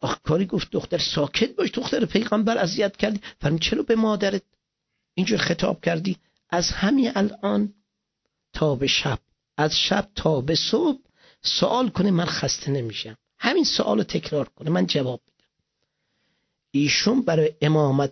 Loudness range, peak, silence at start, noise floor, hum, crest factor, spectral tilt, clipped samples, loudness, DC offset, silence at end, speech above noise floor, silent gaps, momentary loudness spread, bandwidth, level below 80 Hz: 2 LU; -4 dBFS; 0 s; -79 dBFS; none; 18 dB; -5 dB/octave; under 0.1%; -23 LUFS; under 0.1%; 0 s; 57 dB; none; 8 LU; 6.4 kHz; -48 dBFS